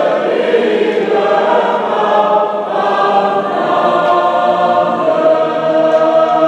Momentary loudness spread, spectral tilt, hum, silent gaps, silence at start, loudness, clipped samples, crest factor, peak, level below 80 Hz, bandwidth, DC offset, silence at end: 3 LU; -6 dB/octave; none; none; 0 s; -12 LUFS; under 0.1%; 10 dB; -2 dBFS; -66 dBFS; 8.6 kHz; under 0.1%; 0 s